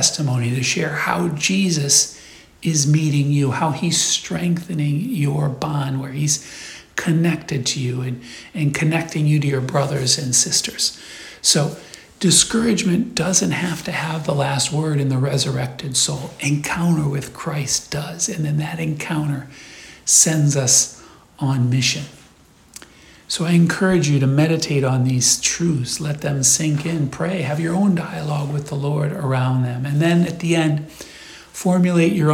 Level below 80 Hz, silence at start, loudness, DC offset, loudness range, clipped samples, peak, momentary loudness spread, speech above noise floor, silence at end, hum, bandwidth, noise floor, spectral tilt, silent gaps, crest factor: -52 dBFS; 0 s; -19 LUFS; under 0.1%; 4 LU; under 0.1%; 0 dBFS; 10 LU; 31 dB; 0 s; none; 16.5 kHz; -50 dBFS; -4 dB/octave; none; 18 dB